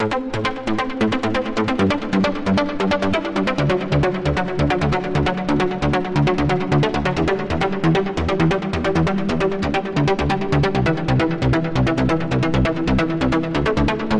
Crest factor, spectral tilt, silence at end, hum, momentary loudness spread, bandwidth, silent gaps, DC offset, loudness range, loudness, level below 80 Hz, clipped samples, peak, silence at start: 12 dB; -7 dB/octave; 0 s; none; 3 LU; 10.5 kHz; none; under 0.1%; 1 LU; -20 LUFS; -34 dBFS; under 0.1%; -6 dBFS; 0 s